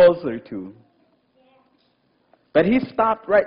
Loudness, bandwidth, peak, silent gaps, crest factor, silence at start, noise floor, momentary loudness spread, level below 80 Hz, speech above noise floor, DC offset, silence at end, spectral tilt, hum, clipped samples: -20 LUFS; 5.4 kHz; -4 dBFS; none; 16 dB; 0 s; -64 dBFS; 17 LU; -56 dBFS; 45 dB; under 0.1%; 0 s; -9.5 dB/octave; none; under 0.1%